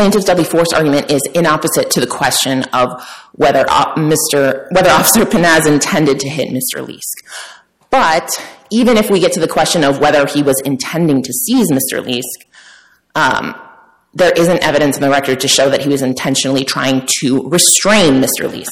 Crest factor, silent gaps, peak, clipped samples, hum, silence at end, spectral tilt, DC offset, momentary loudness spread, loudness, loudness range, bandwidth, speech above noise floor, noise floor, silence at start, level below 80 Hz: 12 dB; none; 0 dBFS; under 0.1%; none; 0 s; -3.5 dB/octave; under 0.1%; 10 LU; -12 LUFS; 4 LU; 16.5 kHz; 32 dB; -44 dBFS; 0 s; -44 dBFS